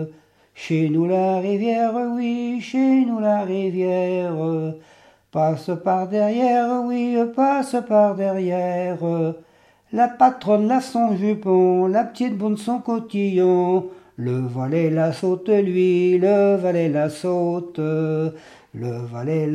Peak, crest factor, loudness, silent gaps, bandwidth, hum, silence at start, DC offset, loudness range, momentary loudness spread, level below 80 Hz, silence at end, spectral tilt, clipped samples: -2 dBFS; 18 dB; -20 LUFS; none; 11.5 kHz; none; 0 s; under 0.1%; 3 LU; 9 LU; -70 dBFS; 0 s; -8 dB/octave; under 0.1%